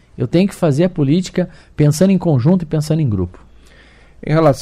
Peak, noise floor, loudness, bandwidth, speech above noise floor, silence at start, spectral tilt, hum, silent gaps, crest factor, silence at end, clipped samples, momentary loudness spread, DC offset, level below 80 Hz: -2 dBFS; -44 dBFS; -16 LUFS; 14.5 kHz; 30 dB; 0.2 s; -7.5 dB/octave; none; none; 14 dB; 0 s; under 0.1%; 9 LU; under 0.1%; -42 dBFS